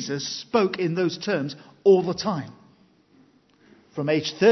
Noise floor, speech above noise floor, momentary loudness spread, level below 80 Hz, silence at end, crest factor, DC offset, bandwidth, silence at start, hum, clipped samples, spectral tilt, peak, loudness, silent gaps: -58 dBFS; 35 dB; 13 LU; -68 dBFS; 0 s; 18 dB; under 0.1%; 6.2 kHz; 0 s; none; under 0.1%; -5.5 dB/octave; -6 dBFS; -24 LUFS; none